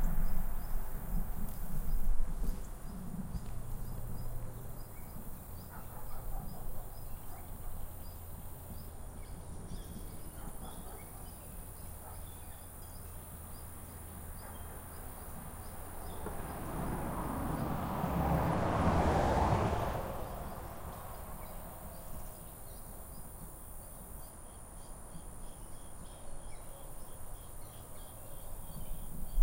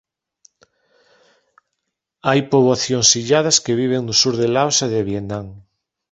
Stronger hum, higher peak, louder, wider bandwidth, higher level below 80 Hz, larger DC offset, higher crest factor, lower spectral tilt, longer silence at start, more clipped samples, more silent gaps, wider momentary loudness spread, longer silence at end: neither; second, -16 dBFS vs 0 dBFS; second, -41 LUFS vs -16 LUFS; first, 16 kHz vs 8.4 kHz; first, -40 dBFS vs -54 dBFS; neither; about the same, 20 dB vs 20 dB; first, -6 dB/octave vs -3 dB/octave; second, 0 s vs 2.25 s; neither; neither; first, 17 LU vs 11 LU; second, 0 s vs 0.5 s